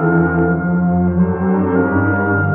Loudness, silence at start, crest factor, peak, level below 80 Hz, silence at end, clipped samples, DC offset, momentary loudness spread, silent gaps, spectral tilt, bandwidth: -15 LUFS; 0 s; 12 dB; -4 dBFS; -42 dBFS; 0 s; under 0.1%; under 0.1%; 2 LU; none; -10.5 dB/octave; 2.9 kHz